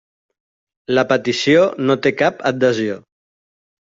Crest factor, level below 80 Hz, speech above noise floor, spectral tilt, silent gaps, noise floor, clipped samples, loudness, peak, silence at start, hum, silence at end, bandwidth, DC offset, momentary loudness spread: 16 dB; -60 dBFS; over 74 dB; -5 dB/octave; none; under -90 dBFS; under 0.1%; -17 LUFS; -2 dBFS; 0.9 s; none; 0.95 s; 7.8 kHz; under 0.1%; 10 LU